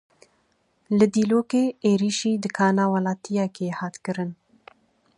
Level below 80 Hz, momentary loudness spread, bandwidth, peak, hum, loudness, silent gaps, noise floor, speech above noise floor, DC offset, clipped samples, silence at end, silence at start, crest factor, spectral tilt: -68 dBFS; 10 LU; 11 kHz; -6 dBFS; none; -23 LUFS; none; -67 dBFS; 45 dB; under 0.1%; under 0.1%; 0.85 s; 0.9 s; 18 dB; -6 dB/octave